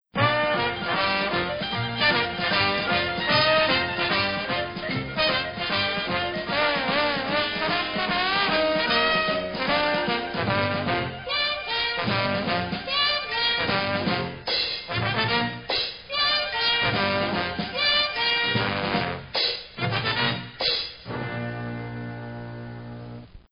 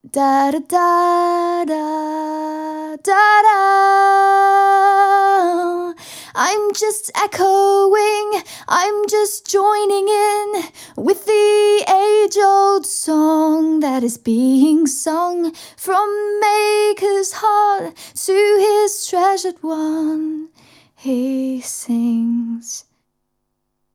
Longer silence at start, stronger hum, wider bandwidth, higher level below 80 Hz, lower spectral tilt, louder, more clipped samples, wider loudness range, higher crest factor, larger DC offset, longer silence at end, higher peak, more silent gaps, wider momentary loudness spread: about the same, 0.15 s vs 0.05 s; neither; second, 6.6 kHz vs 16.5 kHz; first, -52 dBFS vs -70 dBFS; first, -7 dB/octave vs -2.5 dB/octave; second, -24 LUFS vs -15 LUFS; neither; second, 3 LU vs 7 LU; about the same, 18 dB vs 14 dB; neither; second, 0.15 s vs 1.15 s; second, -6 dBFS vs -2 dBFS; neither; second, 9 LU vs 12 LU